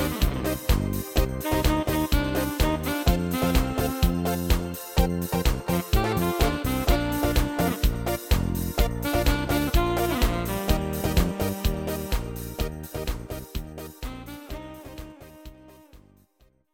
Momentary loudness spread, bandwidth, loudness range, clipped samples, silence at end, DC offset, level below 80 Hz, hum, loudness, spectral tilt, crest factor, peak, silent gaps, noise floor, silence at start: 14 LU; 17 kHz; 11 LU; under 0.1%; 0.75 s; under 0.1%; -30 dBFS; none; -26 LUFS; -5.5 dB/octave; 18 dB; -8 dBFS; none; -63 dBFS; 0 s